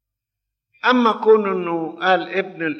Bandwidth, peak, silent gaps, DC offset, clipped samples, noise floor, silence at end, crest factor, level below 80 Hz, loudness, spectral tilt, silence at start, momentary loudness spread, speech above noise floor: 6.2 kHz; -4 dBFS; none; under 0.1%; under 0.1%; -83 dBFS; 0 s; 16 dB; -76 dBFS; -18 LUFS; -6 dB/octave; 0.85 s; 8 LU; 65 dB